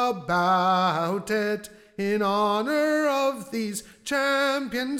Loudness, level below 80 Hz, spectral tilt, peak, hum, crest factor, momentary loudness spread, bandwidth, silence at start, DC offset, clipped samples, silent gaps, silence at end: -24 LUFS; -62 dBFS; -4.5 dB/octave; -12 dBFS; none; 12 dB; 10 LU; 17 kHz; 0 s; under 0.1%; under 0.1%; none; 0 s